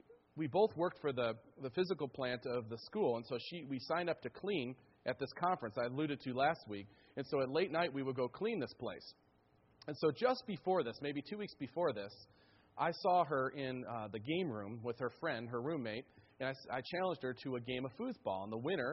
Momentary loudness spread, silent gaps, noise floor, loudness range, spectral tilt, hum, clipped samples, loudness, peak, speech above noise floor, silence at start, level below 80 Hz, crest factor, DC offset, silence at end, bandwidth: 11 LU; none; -71 dBFS; 3 LU; -4 dB/octave; none; under 0.1%; -40 LUFS; -20 dBFS; 32 dB; 0.1 s; -76 dBFS; 18 dB; under 0.1%; 0 s; 5.8 kHz